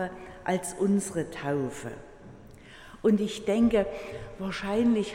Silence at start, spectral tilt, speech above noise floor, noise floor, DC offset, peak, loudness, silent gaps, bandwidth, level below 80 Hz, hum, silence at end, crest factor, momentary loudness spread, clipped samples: 0 s; -5.5 dB/octave; 21 dB; -49 dBFS; under 0.1%; -12 dBFS; -28 LUFS; none; 16 kHz; -52 dBFS; none; 0 s; 16 dB; 16 LU; under 0.1%